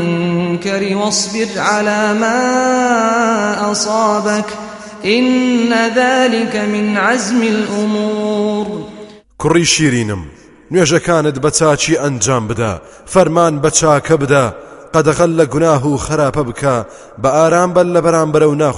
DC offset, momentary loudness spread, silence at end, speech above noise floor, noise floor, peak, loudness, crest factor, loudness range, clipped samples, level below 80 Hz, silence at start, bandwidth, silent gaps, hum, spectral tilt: under 0.1%; 7 LU; 0 s; 22 dB; -35 dBFS; 0 dBFS; -13 LUFS; 14 dB; 2 LU; under 0.1%; -42 dBFS; 0 s; 11.5 kHz; none; none; -4.5 dB/octave